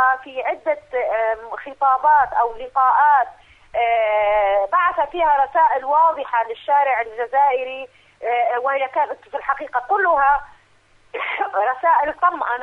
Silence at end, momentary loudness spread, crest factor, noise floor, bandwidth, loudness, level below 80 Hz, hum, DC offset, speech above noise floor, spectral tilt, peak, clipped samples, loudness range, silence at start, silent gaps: 0 s; 10 LU; 14 dB; -55 dBFS; 4.5 kHz; -19 LUFS; -54 dBFS; none; under 0.1%; 36 dB; -4.5 dB/octave; -6 dBFS; under 0.1%; 3 LU; 0 s; none